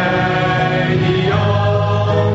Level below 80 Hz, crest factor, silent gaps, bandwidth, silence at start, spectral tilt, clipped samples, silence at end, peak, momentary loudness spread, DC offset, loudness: -38 dBFS; 12 dB; none; 7.8 kHz; 0 s; -5 dB/octave; under 0.1%; 0 s; -2 dBFS; 1 LU; under 0.1%; -15 LUFS